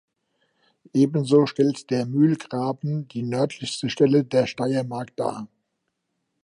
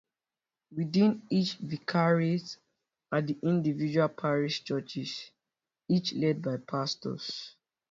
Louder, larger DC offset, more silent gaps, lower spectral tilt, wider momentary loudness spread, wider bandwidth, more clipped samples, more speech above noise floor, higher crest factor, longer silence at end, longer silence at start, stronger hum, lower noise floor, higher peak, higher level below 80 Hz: first, -23 LUFS vs -30 LUFS; neither; neither; about the same, -6.5 dB/octave vs -6.5 dB/octave; second, 10 LU vs 13 LU; first, 11.5 kHz vs 7.6 kHz; neither; second, 55 dB vs over 60 dB; about the same, 18 dB vs 18 dB; first, 0.95 s vs 0.4 s; first, 0.95 s vs 0.7 s; neither; second, -77 dBFS vs under -90 dBFS; first, -6 dBFS vs -14 dBFS; about the same, -68 dBFS vs -72 dBFS